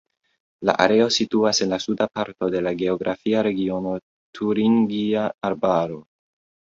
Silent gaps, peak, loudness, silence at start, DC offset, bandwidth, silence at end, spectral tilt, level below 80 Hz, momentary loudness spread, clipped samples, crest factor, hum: 4.03-4.33 s; 0 dBFS; -22 LUFS; 0.6 s; under 0.1%; 7.8 kHz; 0.65 s; -4.5 dB/octave; -58 dBFS; 8 LU; under 0.1%; 22 dB; none